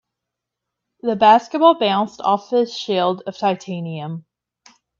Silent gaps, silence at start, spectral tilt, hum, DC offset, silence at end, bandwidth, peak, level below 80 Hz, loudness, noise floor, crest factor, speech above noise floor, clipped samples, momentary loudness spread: none; 1.05 s; -5.5 dB/octave; none; under 0.1%; 0.8 s; 7.4 kHz; 0 dBFS; -68 dBFS; -18 LUFS; -82 dBFS; 18 dB; 65 dB; under 0.1%; 15 LU